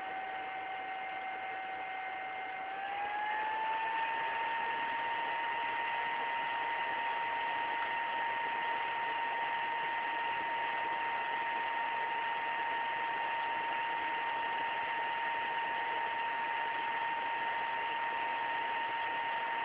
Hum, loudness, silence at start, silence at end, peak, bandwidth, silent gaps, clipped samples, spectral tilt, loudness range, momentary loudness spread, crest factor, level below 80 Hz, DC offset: none; -35 LUFS; 0 s; 0 s; -24 dBFS; 4 kHz; none; under 0.1%; 1.5 dB/octave; 2 LU; 5 LU; 12 dB; -76 dBFS; under 0.1%